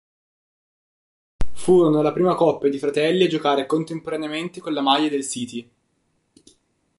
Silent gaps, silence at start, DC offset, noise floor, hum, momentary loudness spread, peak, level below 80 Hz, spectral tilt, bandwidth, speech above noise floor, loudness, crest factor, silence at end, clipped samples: none; 1.4 s; under 0.1%; -69 dBFS; none; 12 LU; -4 dBFS; -44 dBFS; -5 dB/octave; 11.5 kHz; 49 dB; -21 LUFS; 18 dB; 0 s; under 0.1%